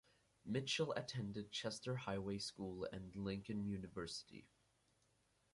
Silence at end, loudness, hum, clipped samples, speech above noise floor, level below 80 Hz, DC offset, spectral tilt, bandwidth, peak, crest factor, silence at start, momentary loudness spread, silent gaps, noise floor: 1.1 s; -45 LUFS; none; under 0.1%; 34 dB; -70 dBFS; under 0.1%; -5 dB/octave; 11.5 kHz; -28 dBFS; 18 dB; 0.45 s; 8 LU; none; -80 dBFS